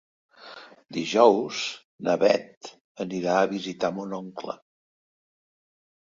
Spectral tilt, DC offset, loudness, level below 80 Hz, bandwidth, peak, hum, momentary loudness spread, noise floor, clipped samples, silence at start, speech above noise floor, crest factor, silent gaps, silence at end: -4.5 dB/octave; under 0.1%; -25 LUFS; -72 dBFS; 7.6 kHz; -4 dBFS; none; 24 LU; -47 dBFS; under 0.1%; 0.4 s; 22 dB; 24 dB; 1.84-1.98 s, 2.57-2.61 s, 2.80-2.95 s; 1.5 s